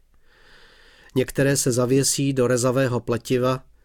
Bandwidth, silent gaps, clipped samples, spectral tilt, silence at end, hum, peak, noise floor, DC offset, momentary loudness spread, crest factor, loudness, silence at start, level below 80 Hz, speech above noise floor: 18.5 kHz; none; under 0.1%; -4.5 dB/octave; 0.25 s; none; -8 dBFS; -54 dBFS; under 0.1%; 6 LU; 14 dB; -21 LUFS; 1.15 s; -50 dBFS; 33 dB